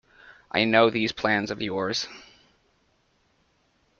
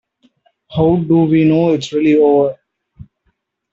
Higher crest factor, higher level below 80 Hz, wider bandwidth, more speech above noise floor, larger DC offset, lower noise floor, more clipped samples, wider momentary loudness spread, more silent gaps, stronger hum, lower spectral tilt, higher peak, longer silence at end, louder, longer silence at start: first, 22 dB vs 14 dB; second, -62 dBFS vs -48 dBFS; about the same, 7.4 kHz vs 7.6 kHz; second, 43 dB vs 54 dB; neither; about the same, -67 dBFS vs -66 dBFS; neither; first, 11 LU vs 5 LU; neither; neither; second, -4.5 dB/octave vs -8 dB/octave; second, -6 dBFS vs -2 dBFS; first, 1.8 s vs 1.2 s; second, -24 LUFS vs -13 LUFS; second, 0.25 s vs 0.7 s